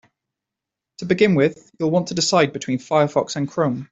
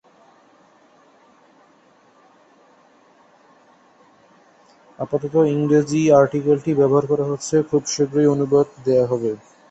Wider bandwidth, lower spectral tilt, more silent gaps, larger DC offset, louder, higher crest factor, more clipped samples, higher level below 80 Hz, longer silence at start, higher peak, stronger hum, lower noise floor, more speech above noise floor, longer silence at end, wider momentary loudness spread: about the same, 8.2 kHz vs 8.4 kHz; second, -5 dB/octave vs -6.5 dB/octave; neither; neither; about the same, -20 LUFS vs -18 LUFS; about the same, 18 dB vs 18 dB; neither; about the same, -60 dBFS vs -60 dBFS; second, 1 s vs 5 s; about the same, -2 dBFS vs -2 dBFS; neither; first, -85 dBFS vs -55 dBFS; first, 66 dB vs 37 dB; second, 0.05 s vs 0.35 s; about the same, 8 LU vs 9 LU